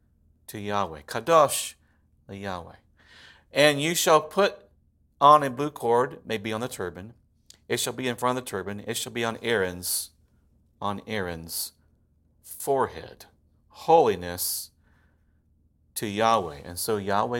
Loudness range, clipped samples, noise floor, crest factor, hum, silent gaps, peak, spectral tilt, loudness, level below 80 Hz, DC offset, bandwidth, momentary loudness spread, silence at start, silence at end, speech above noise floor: 8 LU; under 0.1%; -64 dBFS; 24 dB; none; none; -4 dBFS; -3.5 dB/octave; -25 LUFS; -60 dBFS; under 0.1%; 17 kHz; 16 LU; 0.5 s; 0 s; 39 dB